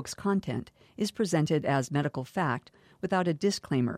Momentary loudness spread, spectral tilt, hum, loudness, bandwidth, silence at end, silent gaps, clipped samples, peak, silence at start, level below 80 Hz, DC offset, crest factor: 10 LU; -6 dB/octave; none; -30 LUFS; 15 kHz; 0 s; none; under 0.1%; -14 dBFS; 0 s; -64 dBFS; under 0.1%; 16 dB